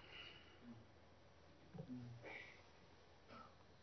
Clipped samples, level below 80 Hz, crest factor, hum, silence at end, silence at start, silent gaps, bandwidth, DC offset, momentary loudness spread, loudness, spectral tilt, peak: under 0.1%; -76 dBFS; 18 dB; none; 0 s; 0 s; none; 6.2 kHz; under 0.1%; 13 LU; -59 LUFS; -4 dB/octave; -40 dBFS